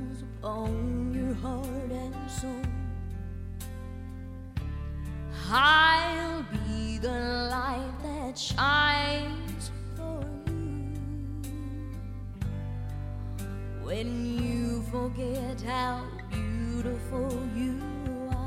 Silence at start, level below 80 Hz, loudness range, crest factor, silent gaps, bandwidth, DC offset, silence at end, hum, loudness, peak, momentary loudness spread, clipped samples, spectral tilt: 0 s; -40 dBFS; 11 LU; 22 dB; none; 16 kHz; under 0.1%; 0 s; none; -31 LUFS; -8 dBFS; 14 LU; under 0.1%; -5 dB/octave